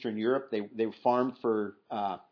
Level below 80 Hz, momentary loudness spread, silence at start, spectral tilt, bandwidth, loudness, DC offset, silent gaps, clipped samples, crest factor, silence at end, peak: -84 dBFS; 7 LU; 0 s; -8 dB/octave; 5.4 kHz; -31 LUFS; under 0.1%; none; under 0.1%; 18 dB; 0.1 s; -14 dBFS